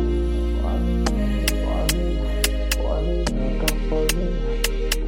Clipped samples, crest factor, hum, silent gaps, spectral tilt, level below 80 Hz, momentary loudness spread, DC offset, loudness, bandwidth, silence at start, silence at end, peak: under 0.1%; 18 dB; none; none; -4.5 dB/octave; -22 dBFS; 2 LU; under 0.1%; -23 LUFS; 17 kHz; 0 s; 0 s; -2 dBFS